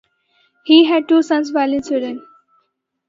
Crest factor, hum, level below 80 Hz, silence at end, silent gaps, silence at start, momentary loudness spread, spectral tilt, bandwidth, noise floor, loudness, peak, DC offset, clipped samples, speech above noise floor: 18 dB; none; -62 dBFS; 0.9 s; none; 0.65 s; 18 LU; -3.5 dB/octave; 7.6 kHz; -67 dBFS; -15 LUFS; 0 dBFS; under 0.1%; under 0.1%; 53 dB